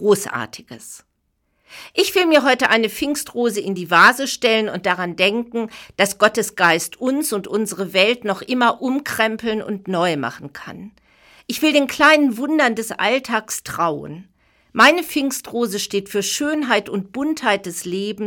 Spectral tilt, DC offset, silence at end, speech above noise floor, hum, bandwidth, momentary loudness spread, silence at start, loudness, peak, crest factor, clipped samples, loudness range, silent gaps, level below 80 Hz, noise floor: -3 dB/octave; under 0.1%; 0 s; 50 dB; none; 19 kHz; 15 LU; 0 s; -18 LUFS; -2 dBFS; 18 dB; under 0.1%; 4 LU; none; -60 dBFS; -69 dBFS